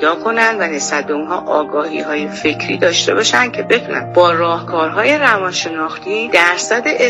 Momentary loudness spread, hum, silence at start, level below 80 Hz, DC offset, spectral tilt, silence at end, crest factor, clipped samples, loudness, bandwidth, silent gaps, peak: 8 LU; none; 0 s; -58 dBFS; under 0.1%; -3 dB/octave; 0 s; 14 dB; under 0.1%; -14 LUFS; 13 kHz; none; 0 dBFS